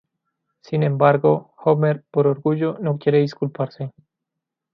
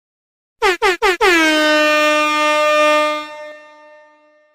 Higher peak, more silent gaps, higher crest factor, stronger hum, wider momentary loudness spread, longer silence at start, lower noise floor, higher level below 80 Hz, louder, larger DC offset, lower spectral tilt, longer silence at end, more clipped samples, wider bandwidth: about the same, -2 dBFS vs -4 dBFS; neither; first, 20 dB vs 12 dB; neither; first, 11 LU vs 8 LU; about the same, 0.7 s vs 0.6 s; first, -83 dBFS vs -51 dBFS; second, -66 dBFS vs -48 dBFS; second, -20 LUFS vs -13 LUFS; neither; first, -9.5 dB/octave vs -1 dB/octave; about the same, 0.85 s vs 0.95 s; neither; second, 6.2 kHz vs 16 kHz